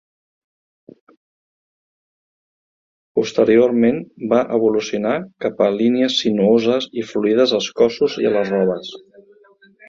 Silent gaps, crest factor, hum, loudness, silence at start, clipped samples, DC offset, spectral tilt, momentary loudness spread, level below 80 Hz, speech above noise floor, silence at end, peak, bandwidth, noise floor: none; 18 dB; none; -17 LUFS; 3.15 s; under 0.1%; under 0.1%; -5.5 dB/octave; 8 LU; -60 dBFS; 34 dB; 0.9 s; -2 dBFS; 7.6 kHz; -51 dBFS